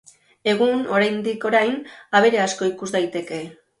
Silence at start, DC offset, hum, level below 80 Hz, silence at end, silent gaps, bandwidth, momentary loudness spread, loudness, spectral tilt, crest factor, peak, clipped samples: 0.45 s; under 0.1%; none; -66 dBFS; 0.25 s; none; 11.5 kHz; 13 LU; -21 LUFS; -4 dB/octave; 18 dB; -4 dBFS; under 0.1%